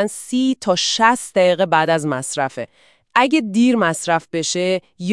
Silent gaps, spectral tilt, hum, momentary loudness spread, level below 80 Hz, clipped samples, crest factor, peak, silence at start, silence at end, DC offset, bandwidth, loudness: none; -4 dB/octave; none; 8 LU; -68 dBFS; under 0.1%; 18 dB; 0 dBFS; 0 s; 0 s; 0.1%; 12 kHz; -17 LUFS